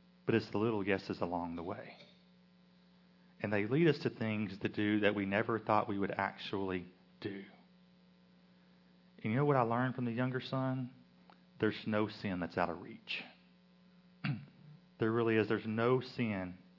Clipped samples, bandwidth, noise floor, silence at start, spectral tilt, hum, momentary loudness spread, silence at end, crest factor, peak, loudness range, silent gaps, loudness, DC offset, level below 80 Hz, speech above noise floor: under 0.1%; 6 kHz; -65 dBFS; 0.25 s; -5.5 dB/octave; none; 13 LU; 0.2 s; 22 dB; -16 dBFS; 6 LU; none; -36 LUFS; under 0.1%; -78 dBFS; 30 dB